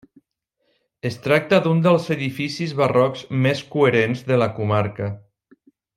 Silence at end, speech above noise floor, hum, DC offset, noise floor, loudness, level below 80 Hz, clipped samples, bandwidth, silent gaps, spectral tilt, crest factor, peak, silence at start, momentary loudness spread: 0.8 s; 53 dB; none; under 0.1%; -72 dBFS; -20 LUFS; -60 dBFS; under 0.1%; 15.5 kHz; none; -7 dB/octave; 20 dB; -2 dBFS; 1.05 s; 12 LU